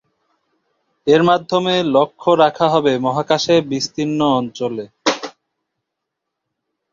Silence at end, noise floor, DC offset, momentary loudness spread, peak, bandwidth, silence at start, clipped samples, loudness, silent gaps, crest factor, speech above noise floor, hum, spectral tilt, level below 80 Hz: 1.65 s; -79 dBFS; under 0.1%; 10 LU; 0 dBFS; 7.6 kHz; 1.05 s; under 0.1%; -17 LUFS; none; 18 dB; 63 dB; none; -5 dB/octave; -60 dBFS